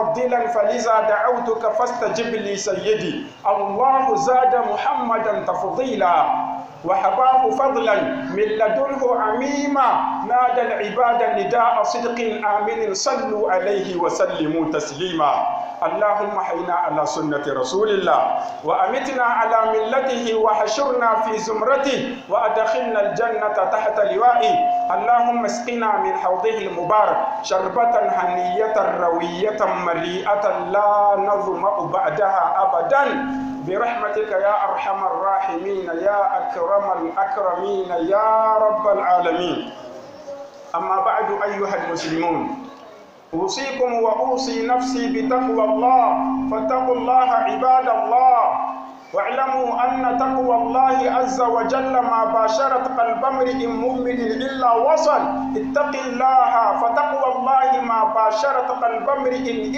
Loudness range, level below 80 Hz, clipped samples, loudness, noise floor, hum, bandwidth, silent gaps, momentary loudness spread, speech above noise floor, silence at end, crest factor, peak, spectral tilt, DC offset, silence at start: 3 LU; -56 dBFS; under 0.1%; -19 LUFS; -43 dBFS; none; 8.2 kHz; none; 7 LU; 24 dB; 0 s; 14 dB; -6 dBFS; -4 dB/octave; under 0.1%; 0 s